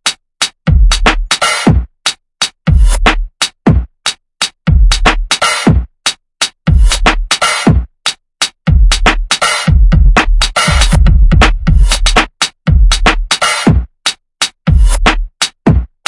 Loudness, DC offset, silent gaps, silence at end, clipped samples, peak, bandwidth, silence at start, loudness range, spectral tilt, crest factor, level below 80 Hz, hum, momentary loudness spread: -11 LUFS; under 0.1%; none; 0.2 s; 0.2%; 0 dBFS; 11.5 kHz; 0.05 s; 3 LU; -4 dB/octave; 10 dB; -12 dBFS; none; 7 LU